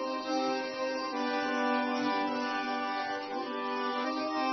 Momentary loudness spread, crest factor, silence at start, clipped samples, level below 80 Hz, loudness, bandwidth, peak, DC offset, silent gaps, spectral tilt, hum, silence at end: 5 LU; 14 dB; 0 s; under 0.1%; -78 dBFS; -32 LUFS; 6.4 kHz; -18 dBFS; under 0.1%; none; -0.5 dB/octave; none; 0 s